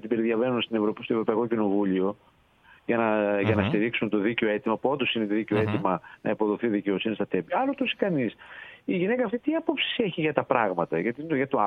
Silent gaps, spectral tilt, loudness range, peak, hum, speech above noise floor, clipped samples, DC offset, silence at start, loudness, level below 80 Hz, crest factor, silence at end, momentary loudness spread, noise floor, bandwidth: none; -8.5 dB/octave; 2 LU; -6 dBFS; none; 31 dB; under 0.1%; under 0.1%; 0.05 s; -26 LUFS; -66 dBFS; 20 dB; 0 s; 5 LU; -57 dBFS; 4.5 kHz